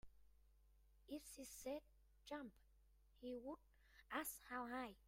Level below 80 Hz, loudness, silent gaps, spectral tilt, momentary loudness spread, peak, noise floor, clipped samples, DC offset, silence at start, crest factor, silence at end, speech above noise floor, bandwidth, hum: -74 dBFS; -53 LUFS; none; -3 dB/octave; 10 LU; -32 dBFS; -74 dBFS; under 0.1%; under 0.1%; 0.05 s; 22 dB; 0 s; 21 dB; 16 kHz; none